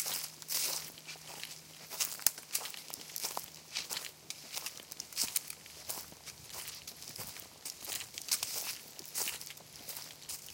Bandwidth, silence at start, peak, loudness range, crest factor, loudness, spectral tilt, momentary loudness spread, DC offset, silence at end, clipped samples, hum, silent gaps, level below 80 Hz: 17 kHz; 0 s; -4 dBFS; 4 LU; 38 dB; -38 LUFS; 0.5 dB/octave; 12 LU; under 0.1%; 0 s; under 0.1%; none; none; -74 dBFS